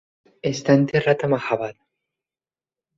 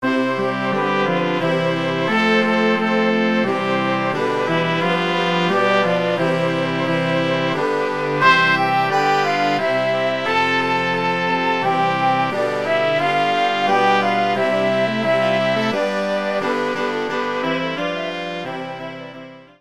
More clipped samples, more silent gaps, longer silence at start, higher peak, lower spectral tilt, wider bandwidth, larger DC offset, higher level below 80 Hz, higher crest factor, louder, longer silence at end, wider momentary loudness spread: neither; neither; first, 0.45 s vs 0 s; about the same, -4 dBFS vs -2 dBFS; about the same, -6.5 dB/octave vs -5.5 dB/octave; second, 7.6 kHz vs 13.5 kHz; second, under 0.1% vs 0.5%; about the same, -60 dBFS vs -64 dBFS; about the same, 20 dB vs 18 dB; second, -21 LUFS vs -18 LUFS; first, 1.25 s vs 0.15 s; first, 11 LU vs 6 LU